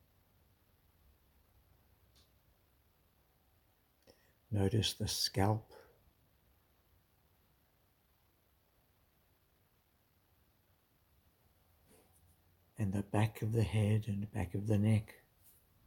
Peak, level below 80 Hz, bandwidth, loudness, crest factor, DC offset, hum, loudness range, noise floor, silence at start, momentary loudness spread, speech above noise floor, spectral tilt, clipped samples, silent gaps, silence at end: -18 dBFS; -66 dBFS; 18 kHz; -35 LUFS; 24 dB; under 0.1%; none; 8 LU; -74 dBFS; 4.5 s; 8 LU; 40 dB; -5.5 dB/octave; under 0.1%; none; 0.75 s